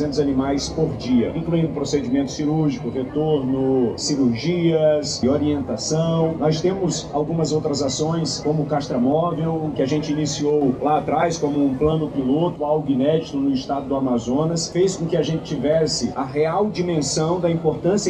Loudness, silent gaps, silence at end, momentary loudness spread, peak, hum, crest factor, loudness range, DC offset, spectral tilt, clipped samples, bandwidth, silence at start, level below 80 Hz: -21 LUFS; none; 0 s; 4 LU; -6 dBFS; none; 14 dB; 1 LU; under 0.1%; -6 dB/octave; under 0.1%; 10 kHz; 0 s; -46 dBFS